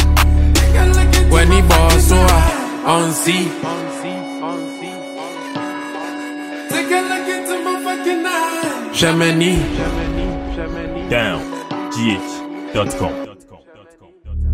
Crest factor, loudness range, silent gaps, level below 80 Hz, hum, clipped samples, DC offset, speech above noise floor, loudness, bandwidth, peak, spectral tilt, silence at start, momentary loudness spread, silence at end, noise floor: 16 dB; 10 LU; none; -18 dBFS; none; under 0.1%; under 0.1%; 29 dB; -17 LUFS; 16 kHz; 0 dBFS; -5 dB/octave; 0 s; 15 LU; 0 s; -46 dBFS